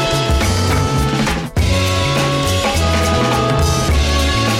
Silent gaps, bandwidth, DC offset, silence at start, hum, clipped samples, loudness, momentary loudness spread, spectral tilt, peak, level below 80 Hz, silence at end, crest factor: none; 16.5 kHz; under 0.1%; 0 s; none; under 0.1%; -15 LUFS; 2 LU; -4.5 dB/octave; -6 dBFS; -22 dBFS; 0 s; 10 dB